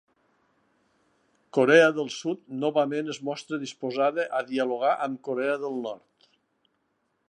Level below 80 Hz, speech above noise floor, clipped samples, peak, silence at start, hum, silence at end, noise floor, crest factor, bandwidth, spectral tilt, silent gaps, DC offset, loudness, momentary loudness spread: -84 dBFS; 49 dB; under 0.1%; -4 dBFS; 1.55 s; none; 1.3 s; -74 dBFS; 24 dB; 10.5 kHz; -5 dB/octave; none; under 0.1%; -26 LUFS; 14 LU